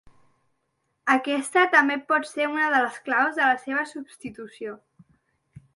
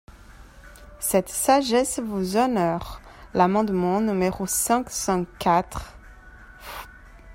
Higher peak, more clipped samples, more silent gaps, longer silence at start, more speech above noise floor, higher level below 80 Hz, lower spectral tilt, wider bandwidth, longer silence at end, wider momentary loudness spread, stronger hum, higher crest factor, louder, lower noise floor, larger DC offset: about the same, -6 dBFS vs -6 dBFS; neither; neither; first, 1.05 s vs 0.15 s; first, 51 dB vs 24 dB; second, -70 dBFS vs -46 dBFS; second, -3 dB/octave vs -4.5 dB/octave; second, 11.5 kHz vs 16.5 kHz; first, 0.15 s vs 0 s; about the same, 19 LU vs 18 LU; neither; about the same, 20 dB vs 20 dB; about the same, -22 LUFS vs -23 LUFS; first, -75 dBFS vs -46 dBFS; neither